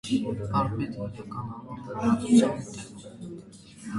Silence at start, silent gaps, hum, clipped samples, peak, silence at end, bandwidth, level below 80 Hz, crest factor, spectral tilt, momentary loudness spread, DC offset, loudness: 0.05 s; none; none; under 0.1%; -8 dBFS; 0 s; 11.5 kHz; -54 dBFS; 20 dB; -6.5 dB/octave; 21 LU; under 0.1%; -27 LUFS